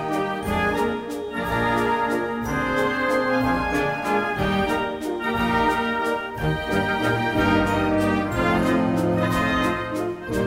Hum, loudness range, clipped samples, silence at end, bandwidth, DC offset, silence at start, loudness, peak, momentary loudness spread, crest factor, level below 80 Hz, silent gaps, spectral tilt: none; 2 LU; under 0.1%; 0 s; 16 kHz; under 0.1%; 0 s; -22 LUFS; -8 dBFS; 5 LU; 14 dB; -40 dBFS; none; -6 dB/octave